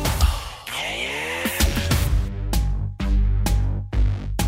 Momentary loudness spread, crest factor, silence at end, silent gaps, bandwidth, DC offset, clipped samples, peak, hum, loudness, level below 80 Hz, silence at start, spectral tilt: 6 LU; 14 dB; 0 s; none; 16.5 kHz; under 0.1%; under 0.1%; -8 dBFS; none; -24 LUFS; -24 dBFS; 0 s; -4.5 dB/octave